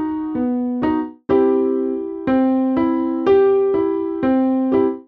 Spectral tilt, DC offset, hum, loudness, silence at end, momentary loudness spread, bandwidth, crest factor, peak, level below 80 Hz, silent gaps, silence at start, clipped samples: -9.5 dB/octave; under 0.1%; none; -18 LUFS; 0.05 s; 7 LU; 4.7 kHz; 12 dB; -6 dBFS; -50 dBFS; none; 0 s; under 0.1%